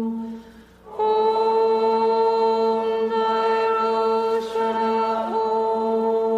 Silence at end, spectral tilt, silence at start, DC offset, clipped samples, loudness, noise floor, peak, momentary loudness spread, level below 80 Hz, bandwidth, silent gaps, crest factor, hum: 0 s; -5.5 dB/octave; 0 s; under 0.1%; under 0.1%; -21 LUFS; -45 dBFS; -10 dBFS; 5 LU; -62 dBFS; 8 kHz; none; 10 dB; none